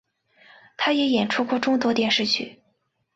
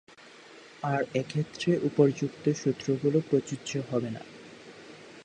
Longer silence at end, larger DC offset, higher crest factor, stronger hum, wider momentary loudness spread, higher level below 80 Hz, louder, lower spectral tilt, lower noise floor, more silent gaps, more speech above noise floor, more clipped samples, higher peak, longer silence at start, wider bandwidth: first, 0.65 s vs 0 s; neither; about the same, 16 dB vs 20 dB; neither; second, 5 LU vs 23 LU; about the same, -66 dBFS vs -70 dBFS; first, -22 LUFS vs -29 LUFS; second, -4 dB/octave vs -6.5 dB/octave; first, -70 dBFS vs -51 dBFS; neither; first, 48 dB vs 23 dB; neither; about the same, -8 dBFS vs -10 dBFS; first, 0.8 s vs 0.25 s; second, 8 kHz vs 9.6 kHz